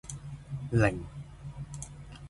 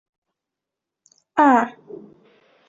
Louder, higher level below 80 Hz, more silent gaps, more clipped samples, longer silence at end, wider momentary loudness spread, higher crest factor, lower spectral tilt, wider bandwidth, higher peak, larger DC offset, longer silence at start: second, -32 LUFS vs -18 LUFS; first, -48 dBFS vs -70 dBFS; neither; neither; second, 0 s vs 1 s; second, 17 LU vs 26 LU; about the same, 22 dB vs 20 dB; about the same, -6.5 dB/octave vs -5.5 dB/octave; first, 11.5 kHz vs 7.8 kHz; second, -10 dBFS vs -2 dBFS; neither; second, 0.05 s vs 1.35 s